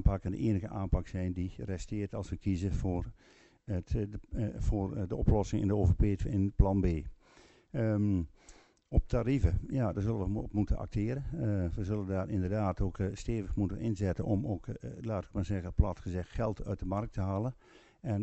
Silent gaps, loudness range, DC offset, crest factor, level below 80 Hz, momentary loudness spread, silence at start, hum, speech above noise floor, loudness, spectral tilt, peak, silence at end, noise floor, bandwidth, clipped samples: none; 5 LU; under 0.1%; 22 dB; -40 dBFS; 9 LU; 0 s; none; 29 dB; -34 LUFS; -8.5 dB/octave; -10 dBFS; 0 s; -61 dBFS; 8.2 kHz; under 0.1%